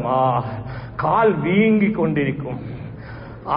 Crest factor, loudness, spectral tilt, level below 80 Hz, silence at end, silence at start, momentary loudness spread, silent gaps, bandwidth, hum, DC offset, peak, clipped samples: 14 dB; -19 LUFS; -12.5 dB/octave; -44 dBFS; 0 s; 0 s; 17 LU; none; 5.4 kHz; none; under 0.1%; -6 dBFS; under 0.1%